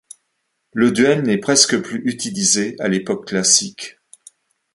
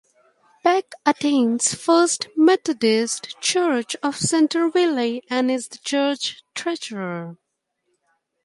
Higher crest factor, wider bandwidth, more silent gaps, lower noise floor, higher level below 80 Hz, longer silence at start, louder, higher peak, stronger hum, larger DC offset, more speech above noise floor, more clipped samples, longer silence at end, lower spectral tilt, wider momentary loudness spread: about the same, 20 dB vs 18 dB; about the same, 11.5 kHz vs 11.5 kHz; neither; about the same, -72 dBFS vs -74 dBFS; first, -60 dBFS vs -66 dBFS; about the same, 0.75 s vs 0.65 s; first, -16 LUFS vs -21 LUFS; about the same, 0 dBFS vs -2 dBFS; neither; neither; about the same, 54 dB vs 53 dB; neither; second, 0.85 s vs 1.1 s; about the same, -2.5 dB/octave vs -3 dB/octave; first, 14 LU vs 10 LU